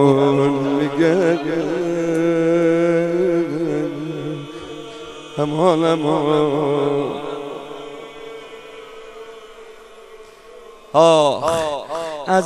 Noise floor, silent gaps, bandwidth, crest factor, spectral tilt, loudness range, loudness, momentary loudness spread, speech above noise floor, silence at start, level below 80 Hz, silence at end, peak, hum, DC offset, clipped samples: -41 dBFS; none; 12.5 kHz; 18 dB; -6 dB/octave; 13 LU; -18 LUFS; 20 LU; 25 dB; 0 s; -56 dBFS; 0 s; 0 dBFS; none; under 0.1%; under 0.1%